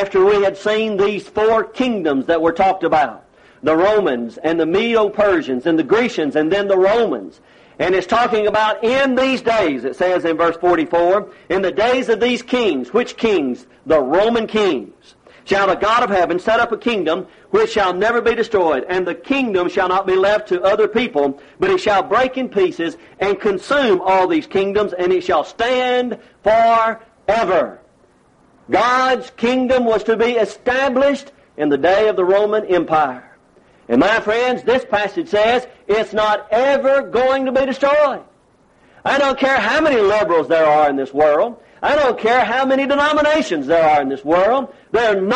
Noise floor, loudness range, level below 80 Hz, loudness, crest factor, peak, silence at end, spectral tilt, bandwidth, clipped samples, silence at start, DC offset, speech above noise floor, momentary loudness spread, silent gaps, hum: -54 dBFS; 2 LU; -50 dBFS; -16 LUFS; 12 dB; -4 dBFS; 0 s; -5 dB/octave; 9.8 kHz; under 0.1%; 0 s; under 0.1%; 38 dB; 6 LU; none; none